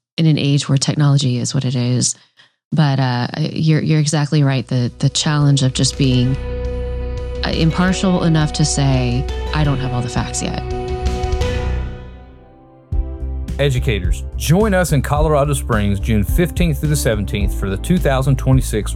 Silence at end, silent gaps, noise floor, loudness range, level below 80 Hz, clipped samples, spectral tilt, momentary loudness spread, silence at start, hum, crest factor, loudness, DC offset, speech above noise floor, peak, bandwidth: 0 s; 2.65-2.71 s; -44 dBFS; 6 LU; -24 dBFS; under 0.1%; -5.5 dB/octave; 9 LU; 0.2 s; none; 14 dB; -17 LUFS; under 0.1%; 28 dB; -4 dBFS; 15.5 kHz